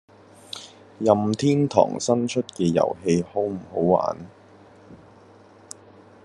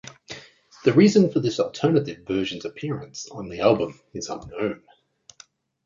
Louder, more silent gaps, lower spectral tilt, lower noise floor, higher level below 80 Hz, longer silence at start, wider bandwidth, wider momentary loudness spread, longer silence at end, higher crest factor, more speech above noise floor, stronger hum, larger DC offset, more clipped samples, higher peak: about the same, -22 LUFS vs -23 LUFS; neither; about the same, -6 dB/octave vs -6 dB/octave; second, -50 dBFS vs -54 dBFS; second, -64 dBFS vs -58 dBFS; first, 0.55 s vs 0.05 s; first, 12 kHz vs 7.6 kHz; about the same, 21 LU vs 20 LU; first, 1.3 s vs 1.1 s; about the same, 22 dB vs 20 dB; about the same, 29 dB vs 32 dB; neither; neither; neither; about the same, -2 dBFS vs -4 dBFS